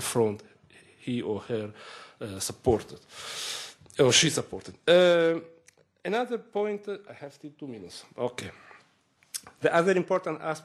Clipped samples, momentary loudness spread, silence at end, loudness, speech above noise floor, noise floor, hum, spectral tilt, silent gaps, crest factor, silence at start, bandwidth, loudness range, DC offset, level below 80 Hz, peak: under 0.1%; 21 LU; 0.05 s; -27 LUFS; 38 dB; -66 dBFS; none; -3.5 dB/octave; none; 22 dB; 0 s; 13 kHz; 10 LU; under 0.1%; -62 dBFS; -8 dBFS